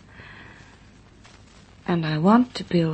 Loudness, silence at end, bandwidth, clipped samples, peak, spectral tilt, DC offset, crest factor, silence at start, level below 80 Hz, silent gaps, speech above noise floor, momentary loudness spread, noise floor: -21 LUFS; 0 s; 8.6 kHz; under 0.1%; -4 dBFS; -7.5 dB/octave; under 0.1%; 20 dB; 0.2 s; -54 dBFS; none; 30 dB; 25 LU; -50 dBFS